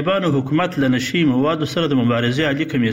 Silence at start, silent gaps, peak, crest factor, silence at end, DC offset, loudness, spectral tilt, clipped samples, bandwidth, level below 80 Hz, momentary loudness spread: 0 s; none; -6 dBFS; 12 dB; 0 s; 0.2%; -18 LUFS; -6 dB/octave; under 0.1%; 16.5 kHz; -52 dBFS; 2 LU